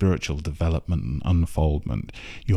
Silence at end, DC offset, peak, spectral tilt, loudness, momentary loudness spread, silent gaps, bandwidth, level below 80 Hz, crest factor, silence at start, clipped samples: 0 s; under 0.1%; -10 dBFS; -7 dB/octave; -26 LUFS; 8 LU; none; 12 kHz; -30 dBFS; 14 dB; 0 s; under 0.1%